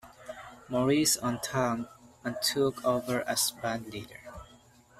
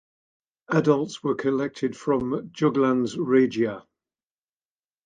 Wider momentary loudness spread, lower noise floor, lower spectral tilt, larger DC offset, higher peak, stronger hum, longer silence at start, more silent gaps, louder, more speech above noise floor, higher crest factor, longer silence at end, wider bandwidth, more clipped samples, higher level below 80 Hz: first, 20 LU vs 7 LU; second, -58 dBFS vs under -90 dBFS; second, -3.5 dB/octave vs -7 dB/octave; neither; second, -14 dBFS vs -6 dBFS; neither; second, 0.05 s vs 0.7 s; neither; second, -29 LUFS vs -24 LUFS; second, 28 dB vs over 67 dB; about the same, 18 dB vs 20 dB; second, 0.45 s vs 1.25 s; first, 15.5 kHz vs 9.4 kHz; neither; about the same, -62 dBFS vs -62 dBFS